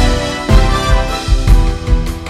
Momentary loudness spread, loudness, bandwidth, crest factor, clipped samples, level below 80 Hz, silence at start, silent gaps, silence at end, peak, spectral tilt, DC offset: 5 LU; -14 LUFS; 12.5 kHz; 10 dB; 0.1%; -12 dBFS; 0 s; none; 0 s; 0 dBFS; -5.5 dB/octave; under 0.1%